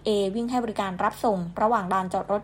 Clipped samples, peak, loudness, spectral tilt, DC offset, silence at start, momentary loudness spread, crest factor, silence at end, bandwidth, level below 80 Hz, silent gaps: under 0.1%; -10 dBFS; -26 LUFS; -6 dB/octave; under 0.1%; 0 s; 3 LU; 14 dB; 0 s; 16 kHz; -54 dBFS; none